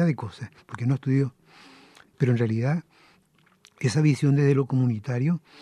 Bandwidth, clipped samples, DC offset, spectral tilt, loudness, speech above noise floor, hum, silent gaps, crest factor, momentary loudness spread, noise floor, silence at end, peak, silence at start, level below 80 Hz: 11 kHz; under 0.1%; under 0.1%; -8 dB/octave; -25 LUFS; 39 dB; none; none; 16 dB; 10 LU; -62 dBFS; 0.25 s; -10 dBFS; 0 s; -68 dBFS